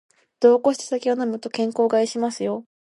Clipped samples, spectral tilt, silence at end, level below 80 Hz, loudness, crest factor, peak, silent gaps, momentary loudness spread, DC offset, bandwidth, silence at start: under 0.1%; -4.5 dB/octave; 0.3 s; -76 dBFS; -21 LUFS; 18 dB; -4 dBFS; none; 10 LU; under 0.1%; 11.5 kHz; 0.4 s